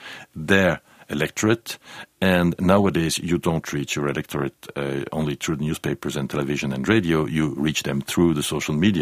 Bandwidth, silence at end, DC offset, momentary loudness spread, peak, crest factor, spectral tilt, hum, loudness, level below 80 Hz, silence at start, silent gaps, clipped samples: 15.5 kHz; 0 s; under 0.1%; 10 LU; -2 dBFS; 20 dB; -5 dB/octave; none; -23 LUFS; -48 dBFS; 0 s; none; under 0.1%